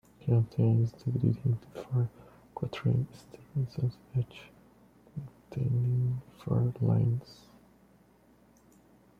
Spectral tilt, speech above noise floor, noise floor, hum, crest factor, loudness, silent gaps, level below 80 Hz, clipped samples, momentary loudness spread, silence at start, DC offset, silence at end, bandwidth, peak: -9.5 dB/octave; 32 dB; -62 dBFS; none; 18 dB; -31 LUFS; none; -60 dBFS; under 0.1%; 16 LU; 0.25 s; under 0.1%; 1.85 s; 5.4 kHz; -14 dBFS